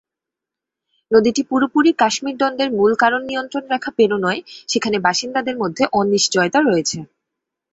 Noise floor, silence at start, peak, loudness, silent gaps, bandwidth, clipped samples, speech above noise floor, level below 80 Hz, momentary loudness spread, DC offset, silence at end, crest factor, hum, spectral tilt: -85 dBFS; 1.1 s; -2 dBFS; -17 LUFS; none; 8.2 kHz; under 0.1%; 68 dB; -60 dBFS; 8 LU; under 0.1%; 0.7 s; 18 dB; none; -3.5 dB/octave